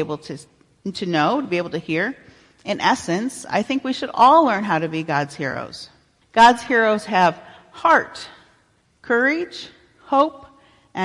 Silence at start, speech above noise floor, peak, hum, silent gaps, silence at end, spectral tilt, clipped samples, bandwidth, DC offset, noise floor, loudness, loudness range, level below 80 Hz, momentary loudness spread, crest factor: 0 s; 41 dB; -4 dBFS; none; none; 0 s; -4.5 dB/octave; under 0.1%; 11.5 kHz; under 0.1%; -60 dBFS; -19 LUFS; 5 LU; -60 dBFS; 22 LU; 18 dB